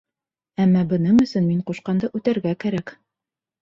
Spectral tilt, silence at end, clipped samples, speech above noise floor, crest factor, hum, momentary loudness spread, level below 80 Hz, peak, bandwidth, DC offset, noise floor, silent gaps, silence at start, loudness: -8.5 dB/octave; 0.7 s; under 0.1%; 68 dB; 14 dB; none; 10 LU; -56 dBFS; -8 dBFS; 7.4 kHz; under 0.1%; -88 dBFS; none; 0.6 s; -21 LUFS